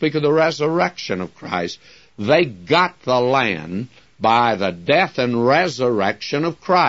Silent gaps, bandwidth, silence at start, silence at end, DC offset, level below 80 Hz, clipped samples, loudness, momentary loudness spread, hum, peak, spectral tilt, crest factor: none; 7.8 kHz; 0 s; 0 s; 0.2%; -60 dBFS; under 0.1%; -19 LUFS; 10 LU; none; -2 dBFS; -5.5 dB/octave; 16 dB